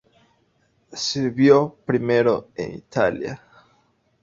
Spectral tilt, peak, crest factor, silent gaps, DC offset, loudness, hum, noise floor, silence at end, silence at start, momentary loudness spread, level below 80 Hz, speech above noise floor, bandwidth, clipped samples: -5.5 dB/octave; -2 dBFS; 20 dB; none; under 0.1%; -21 LUFS; none; -64 dBFS; 0.85 s; 0.9 s; 16 LU; -58 dBFS; 44 dB; 7.6 kHz; under 0.1%